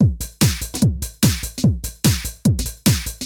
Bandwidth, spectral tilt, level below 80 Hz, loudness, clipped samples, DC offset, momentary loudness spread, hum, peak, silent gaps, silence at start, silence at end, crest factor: 18 kHz; -4.5 dB/octave; -30 dBFS; -19 LUFS; under 0.1%; under 0.1%; 1 LU; none; -2 dBFS; none; 0 s; 0 s; 16 dB